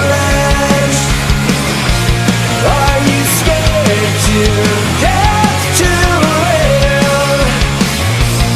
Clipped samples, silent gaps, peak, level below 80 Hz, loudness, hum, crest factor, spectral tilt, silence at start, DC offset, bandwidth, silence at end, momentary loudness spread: under 0.1%; none; 0 dBFS; -18 dBFS; -11 LUFS; none; 10 dB; -4.5 dB/octave; 0 s; under 0.1%; 16 kHz; 0 s; 2 LU